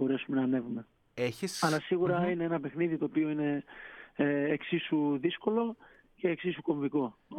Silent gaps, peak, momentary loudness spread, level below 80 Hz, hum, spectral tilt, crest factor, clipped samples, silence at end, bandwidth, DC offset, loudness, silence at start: none; -14 dBFS; 9 LU; -70 dBFS; none; -6 dB/octave; 18 dB; under 0.1%; 0 s; 15 kHz; under 0.1%; -32 LUFS; 0 s